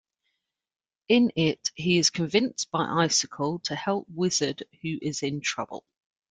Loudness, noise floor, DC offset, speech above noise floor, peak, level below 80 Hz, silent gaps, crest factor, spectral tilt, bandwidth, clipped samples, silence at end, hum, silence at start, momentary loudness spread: -26 LUFS; -80 dBFS; under 0.1%; 54 dB; -8 dBFS; -66 dBFS; none; 20 dB; -3.5 dB/octave; 10.5 kHz; under 0.1%; 0.5 s; none; 1.1 s; 10 LU